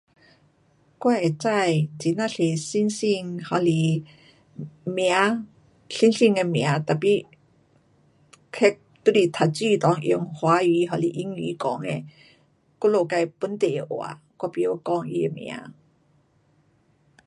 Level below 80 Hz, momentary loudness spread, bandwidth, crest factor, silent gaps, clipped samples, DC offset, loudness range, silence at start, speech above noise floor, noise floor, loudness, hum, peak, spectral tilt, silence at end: -70 dBFS; 12 LU; 11.5 kHz; 22 dB; none; under 0.1%; under 0.1%; 5 LU; 1 s; 40 dB; -63 dBFS; -23 LUFS; none; -2 dBFS; -6 dB/octave; 1.55 s